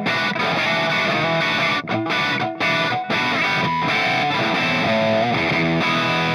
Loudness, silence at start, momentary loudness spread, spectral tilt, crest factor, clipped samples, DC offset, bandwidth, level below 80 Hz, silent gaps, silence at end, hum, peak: -19 LUFS; 0 s; 2 LU; -4.5 dB/octave; 12 dB; under 0.1%; under 0.1%; 13.5 kHz; -58 dBFS; none; 0 s; none; -8 dBFS